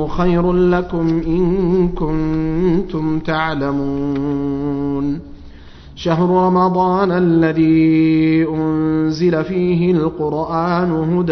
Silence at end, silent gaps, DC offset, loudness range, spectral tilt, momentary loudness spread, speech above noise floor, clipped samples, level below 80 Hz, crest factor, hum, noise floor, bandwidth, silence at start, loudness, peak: 0 s; none; under 0.1%; 5 LU; -9 dB/octave; 7 LU; 22 dB; under 0.1%; -32 dBFS; 14 dB; none; -37 dBFS; 6.4 kHz; 0 s; -16 LUFS; -2 dBFS